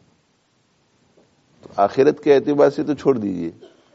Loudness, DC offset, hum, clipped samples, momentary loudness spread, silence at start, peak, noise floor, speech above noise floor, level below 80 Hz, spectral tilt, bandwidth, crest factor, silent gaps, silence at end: -18 LUFS; under 0.1%; none; under 0.1%; 14 LU; 1.75 s; -2 dBFS; -63 dBFS; 45 dB; -64 dBFS; -6 dB/octave; 7.8 kHz; 18 dB; none; 0.45 s